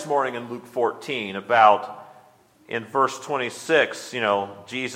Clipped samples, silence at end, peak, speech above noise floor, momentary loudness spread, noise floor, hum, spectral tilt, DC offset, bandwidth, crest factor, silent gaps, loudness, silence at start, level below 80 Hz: under 0.1%; 0 s; 0 dBFS; 32 dB; 15 LU; -55 dBFS; none; -3.5 dB/octave; under 0.1%; 16 kHz; 22 dB; none; -23 LUFS; 0 s; -76 dBFS